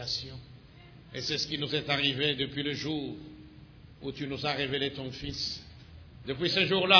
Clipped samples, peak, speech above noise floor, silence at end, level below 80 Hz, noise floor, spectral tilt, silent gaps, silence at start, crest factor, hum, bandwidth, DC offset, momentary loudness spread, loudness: under 0.1%; -4 dBFS; 22 dB; 0 s; -56 dBFS; -52 dBFS; -4 dB/octave; none; 0 s; 26 dB; none; 5.4 kHz; under 0.1%; 22 LU; -31 LUFS